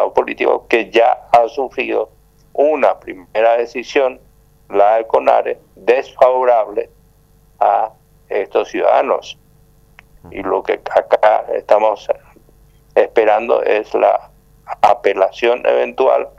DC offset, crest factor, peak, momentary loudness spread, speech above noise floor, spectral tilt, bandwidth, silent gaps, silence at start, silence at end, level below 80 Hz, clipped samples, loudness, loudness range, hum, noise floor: under 0.1%; 16 dB; 0 dBFS; 11 LU; 36 dB; -4.5 dB/octave; 8.6 kHz; none; 0 s; 0.1 s; -52 dBFS; under 0.1%; -15 LUFS; 4 LU; 50 Hz at -55 dBFS; -50 dBFS